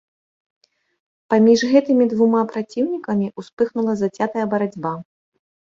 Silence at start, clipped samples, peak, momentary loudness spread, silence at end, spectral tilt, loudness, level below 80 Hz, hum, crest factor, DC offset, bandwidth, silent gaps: 1.3 s; under 0.1%; -2 dBFS; 10 LU; 0.75 s; -6.5 dB/octave; -19 LUFS; -64 dBFS; none; 16 dB; under 0.1%; 7.6 kHz; 3.53-3.57 s